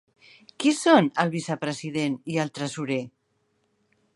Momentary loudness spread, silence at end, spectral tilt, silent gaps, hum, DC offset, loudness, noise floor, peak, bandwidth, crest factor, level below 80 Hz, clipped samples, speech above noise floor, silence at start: 11 LU; 1.1 s; -5 dB/octave; none; none; under 0.1%; -25 LUFS; -71 dBFS; -4 dBFS; 11.5 kHz; 22 dB; -74 dBFS; under 0.1%; 47 dB; 0.6 s